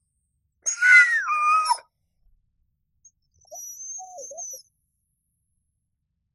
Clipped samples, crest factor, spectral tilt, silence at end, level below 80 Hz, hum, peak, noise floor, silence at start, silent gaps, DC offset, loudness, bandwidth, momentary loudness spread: under 0.1%; 22 dB; 4 dB/octave; 1.75 s; -74 dBFS; none; -4 dBFS; -77 dBFS; 0.65 s; none; under 0.1%; -18 LUFS; 12.5 kHz; 24 LU